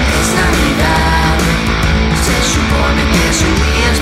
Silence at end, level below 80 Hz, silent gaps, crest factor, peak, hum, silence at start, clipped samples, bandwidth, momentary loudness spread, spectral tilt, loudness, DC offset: 0 s; -16 dBFS; none; 10 dB; 0 dBFS; none; 0 s; under 0.1%; 16 kHz; 2 LU; -4 dB/octave; -12 LUFS; under 0.1%